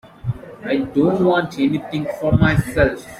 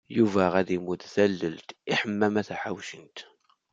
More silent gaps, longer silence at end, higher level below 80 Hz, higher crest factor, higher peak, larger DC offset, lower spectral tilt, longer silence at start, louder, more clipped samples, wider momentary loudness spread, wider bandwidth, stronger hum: neither; second, 0 s vs 0.5 s; first, -36 dBFS vs -70 dBFS; about the same, 16 dB vs 20 dB; first, -2 dBFS vs -6 dBFS; neither; first, -7.5 dB/octave vs -6 dB/octave; first, 0.25 s vs 0.1 s; first, -19 LUFS vs -27 LUFS; neither; second, 13 LU vs 16 LU; first, 15 kHz vs 7.8 kHz; neither